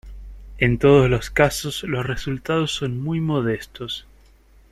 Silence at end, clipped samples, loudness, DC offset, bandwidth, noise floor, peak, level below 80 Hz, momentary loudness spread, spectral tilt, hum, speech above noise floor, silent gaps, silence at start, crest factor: 0.7 s; under 0.1%; -21 LUFS; under 0.1%; 13 kHz; -52 dBFS; -2 dBFS; -38 dBFS; 14 LU; -5.5 dB/octave; none; 31 dB; none; 0.05 s; 20 dB